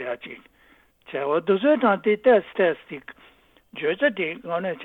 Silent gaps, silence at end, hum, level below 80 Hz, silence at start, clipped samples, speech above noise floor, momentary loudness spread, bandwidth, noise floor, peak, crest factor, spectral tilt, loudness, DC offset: none; 0 s; none; -68 dBFS; 0 s; under 0.1%; 33 dB; 20 LU; 4.2 kHz; -56 dBFS; -6 dBFS; 18 dB; -8 dB/octave; -22 LUFS; under 0.1%